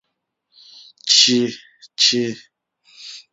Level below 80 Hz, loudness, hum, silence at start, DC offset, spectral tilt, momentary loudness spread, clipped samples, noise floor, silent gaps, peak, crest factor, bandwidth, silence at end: -72 dBFS; -15 LUFS; none; 1.05 s; under 0.1%; -1.5 dB/octave; 25 LU; under 0.1%; -76 dBFS; none; 0 dBFS; 22 dB; 8.4 kHz; 0.15 s